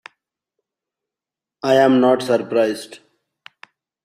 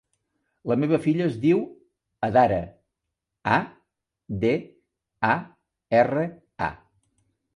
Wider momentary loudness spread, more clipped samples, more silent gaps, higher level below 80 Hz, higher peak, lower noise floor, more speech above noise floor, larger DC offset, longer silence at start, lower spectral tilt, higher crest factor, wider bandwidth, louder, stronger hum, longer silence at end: first, 15 LU vs 12 LU; neither; neither; second, -66 dBFS vs -54 dBFS; first, -2 dBFS vs -6 dBFS; first, -88 dBFS vs -84 dBFS; first, 72 dB vs 61 dB; neither; first, 1.65 s vs 0.65 s; second, -5.5 dB/octave vs -8 dB/octave; about the same, 20 dB vs 20 dB; first, 14.5 kHz vs 11.5 kHz; first, -17 LUFS vs -24 LUFS; neither; first, 1.1 s vs 0.8 s